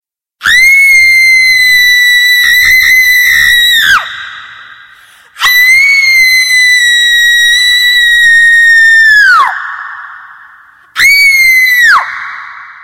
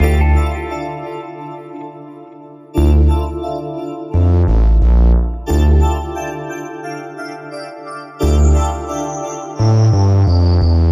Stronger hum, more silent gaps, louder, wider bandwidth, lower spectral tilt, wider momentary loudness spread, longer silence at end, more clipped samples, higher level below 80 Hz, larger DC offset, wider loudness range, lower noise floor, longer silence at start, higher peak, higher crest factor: neither; neither; first, -3 LUFS vs -15 LUFS; first, 17 kHz vs 14.5 kHz; second, 3 dB/octave vs -7.5 dB/octave; about the same, 16 LU vs 17 LU; about the same, 0.1 s vs 0 s; neither; second, -42 dBFS vs -16 dBFS; neither; about the same, 3 LU vs 5 LU; about the same, -38 dBFS vs -37 dBFS; first, 0.4 s vs 0 s; about the same, 0 dBFS vs -2 dBFS; second, 6 dB vs 12 dB